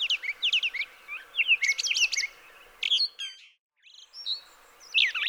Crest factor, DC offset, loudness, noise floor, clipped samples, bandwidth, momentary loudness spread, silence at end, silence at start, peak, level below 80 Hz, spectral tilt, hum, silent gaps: 18 dB; under 0.1%; -26 LUFS; -53 dBFS; under 0.1%; over 20 kHz; 15 LU; 0 s; 0 s; -12 dBFS; -72 dBFS; 5.5 dB/octave; none; 3.59-3.70 s